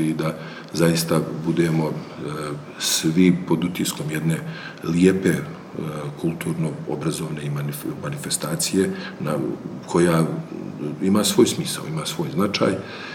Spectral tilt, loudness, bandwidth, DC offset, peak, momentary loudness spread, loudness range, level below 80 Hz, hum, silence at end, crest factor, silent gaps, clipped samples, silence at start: -5 dB/octave; -23 LUFS; 19 kHz; under 0.1%; -4 dBFS; 12 LU; 4 LU; -58 dBFS; none; 0 s; 20 dB; none; under 0.1%; 0 s